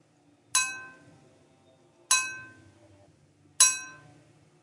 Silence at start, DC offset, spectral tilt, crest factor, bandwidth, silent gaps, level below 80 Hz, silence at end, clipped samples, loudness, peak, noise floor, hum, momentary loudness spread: 0.55 s; under 0.1%; 2.5 dB/octave; 28 dB; 12 kHz; none; -82 dBFS; 0.7 s; under 0.1%; -24 LUFS; -4 dBFS; -63 dBFS; none; 23 LU